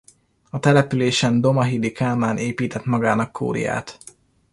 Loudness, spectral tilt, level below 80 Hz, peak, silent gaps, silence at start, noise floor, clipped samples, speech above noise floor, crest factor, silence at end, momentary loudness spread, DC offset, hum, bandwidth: -20 LUFS; -6 dB/octave; -54 dBFS; -2 dBFS; none; 0.55 s; -46 dBFS; under 0.1%; 26 dB; 18 dB; 0.6 s; 8 LU; under 0.1%; none; 11.5 kHz